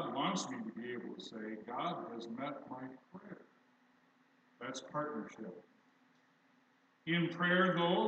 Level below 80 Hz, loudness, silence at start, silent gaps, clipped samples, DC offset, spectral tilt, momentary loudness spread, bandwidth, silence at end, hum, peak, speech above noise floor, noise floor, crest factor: under -90 dBFS; -38 LUFS; 0 s; none; under 0.1%; under 0.1%; -5 dB/octave; 21 LU; 8.4 kHz; 0 s; none; -20 dBFS; 34 dB; -71 dBFS; 20 dB